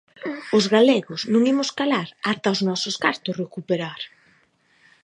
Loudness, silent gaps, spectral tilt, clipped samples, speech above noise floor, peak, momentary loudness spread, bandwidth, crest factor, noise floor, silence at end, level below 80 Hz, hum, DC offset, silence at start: -22 LUFS; none; -4.5 dB/octave; under 0.1%; 40 dB; -2 dBFS; 15 LU; 11 kHz; 20 dB; -61 dBFS; 0.95 s; -72 dBFS; none; under 0.1%; 0.2 s